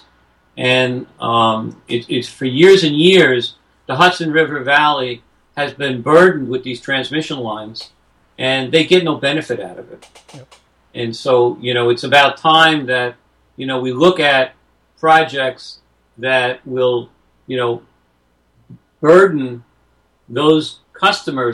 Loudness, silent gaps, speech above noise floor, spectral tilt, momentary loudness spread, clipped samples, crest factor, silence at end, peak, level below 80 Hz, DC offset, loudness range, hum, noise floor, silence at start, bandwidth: -14 LUFS; none; 45 dB; -5 dB/octave; 15 LU; under 0.1%; 16 dB; 0 s; 0 dBFS; -58 dBFS; under 0.1%; 5 LU; none; -59 dBFS; 0.55 s; 11.5 kHz